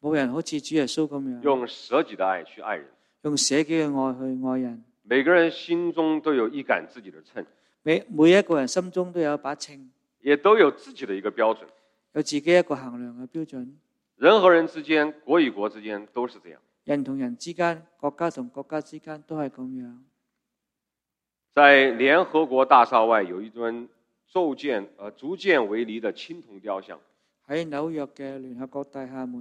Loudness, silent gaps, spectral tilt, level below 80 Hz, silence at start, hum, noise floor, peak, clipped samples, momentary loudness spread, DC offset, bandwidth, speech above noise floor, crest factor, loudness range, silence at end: -23 LUFS; none; -4 dB/octave; -74 dBFS; 0.05 s; none; -87 dBFS; -2 dBFS; under 0.1%; 19 LU; under 0.1%; 11.5 kHz; 63 dB; 22 dB; 11 LU; 0 s